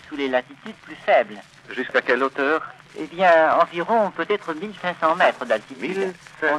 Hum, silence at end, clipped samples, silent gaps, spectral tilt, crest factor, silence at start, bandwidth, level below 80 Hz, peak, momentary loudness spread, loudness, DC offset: none; 0 s; under 0.1%; none; -5 dB/octave; 18 dB; 0.05 s; 11 kHz; -66 dBFS; -4 dBFS; 17 LU; -21 LUFS; under 0.1%